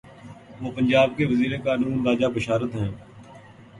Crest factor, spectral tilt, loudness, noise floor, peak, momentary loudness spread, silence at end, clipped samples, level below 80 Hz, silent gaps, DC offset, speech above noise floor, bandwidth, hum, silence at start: 18 dB; -7 dB/octave; -23 LUFS; -46 dBFS; -6 dBFS; 15 LU; 0 s; under 0.1%; -52 dBFS; none; under 0.1%; 24 dB; 11 kHz; none; 0.05 s